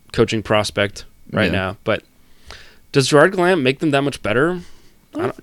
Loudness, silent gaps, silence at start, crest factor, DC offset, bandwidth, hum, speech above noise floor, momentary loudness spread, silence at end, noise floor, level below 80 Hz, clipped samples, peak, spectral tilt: -18 LUFS; none; 0.15 s; 18 dB; under 0.1%; 16.5 kHz; none; 24 dB; 12 LU; 0.1 s; -41 dBFS; -44 dBFS; under 0.1%; 0 dBFS; -5 dB/octave